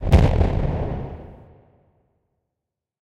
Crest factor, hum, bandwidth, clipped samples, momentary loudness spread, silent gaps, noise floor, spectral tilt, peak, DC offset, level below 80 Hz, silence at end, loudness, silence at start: 22 dB; none; 9.6 kHz; under 0.1%; 22 LU; none; -84 dBFS; -8.5 dB/octave; 0 dBFS; under 0.1%; -26 dBFS; 1.65 s; -21 LUFS; 0 s